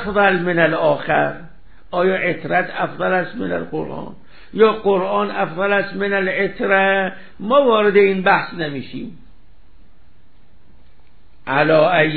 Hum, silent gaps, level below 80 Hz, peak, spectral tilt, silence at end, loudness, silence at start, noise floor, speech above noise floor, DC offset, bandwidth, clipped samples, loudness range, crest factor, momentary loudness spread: none; none; -52 dBFS; 0 dBFS; -10.5 dB/octave; 0 s; -17 LUFS; 0 s; -53 dBFS; 36 dB; 2%; 4.7 kHz; under 0.1%; 6 LU; 18 dB; 16 LU